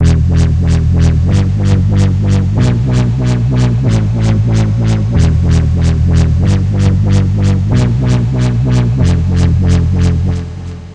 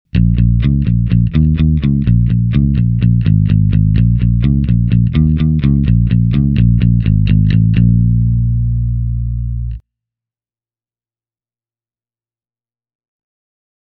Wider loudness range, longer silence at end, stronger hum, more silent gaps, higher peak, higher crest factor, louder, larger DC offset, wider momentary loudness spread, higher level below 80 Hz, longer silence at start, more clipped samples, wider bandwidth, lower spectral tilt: second, 1 LU vs 10 LU; second, 0 s vs 4.05 s; neither; neither; about the same, 0 dBFS vs 0 dBFS; about the same, 10 dB vs 12 dB; about the same, -11 LUFS vs -13 LUFS; neither; second, 2 LU vs 6 LU; about the same, -18 dBFS vs -20 dBFS; second, 0 s vs 0.15 s; neither; first, 9.2 kHz vs 4.5 kHz; second, -7.5 dB/octave vs -11.5 dB/octave